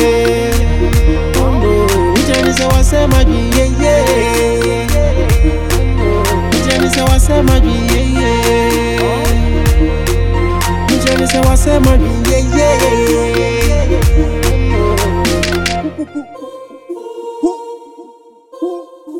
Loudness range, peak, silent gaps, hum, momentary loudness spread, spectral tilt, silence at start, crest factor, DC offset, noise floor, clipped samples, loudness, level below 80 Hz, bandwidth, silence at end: 5 LU; 0 dBFS; none; none; 12 LU; -5.5 dB/octave; 0 s; 12 dB; under 0.1%; -40 dBFS; under 0.1%; -12 LUFS; -16 dBFS; 18 kHz; 0 s